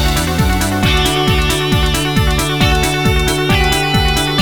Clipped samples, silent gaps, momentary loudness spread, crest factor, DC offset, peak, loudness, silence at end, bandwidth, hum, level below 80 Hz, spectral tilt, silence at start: under 0.1%; none; 2 LU; 12 dB; 0.9%; 0 dBFS; -13 LUFS; 0 s; over 20 kHz; none; -20 dBFS; -4.5 dB/octave; 0 s